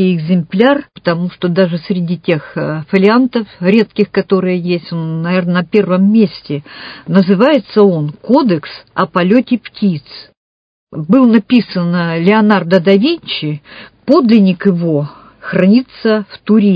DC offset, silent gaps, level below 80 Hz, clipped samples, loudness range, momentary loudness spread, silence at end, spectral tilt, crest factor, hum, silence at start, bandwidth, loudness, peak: under 0.1%; 10.37-10.87 s; -56 dBFS; 0.2%; 2 LU; 10 LU; 0 s; -9.5 dB/octave; 12 dB; none; 0 s; 5.2 kHz; -12 LUFS; 0 dBFS